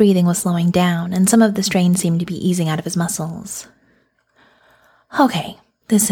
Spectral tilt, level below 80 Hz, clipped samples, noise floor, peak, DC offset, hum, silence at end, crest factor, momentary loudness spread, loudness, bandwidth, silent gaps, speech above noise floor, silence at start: -5 dB/octave; -54 dBFS; under 0.1%; -60 dBFS; -2 dBFS; under 0.1%; none; 0 s; 16 dB; 12 LU; -17 LUFS; 17.5 kHz; none; 43 dB; 0 s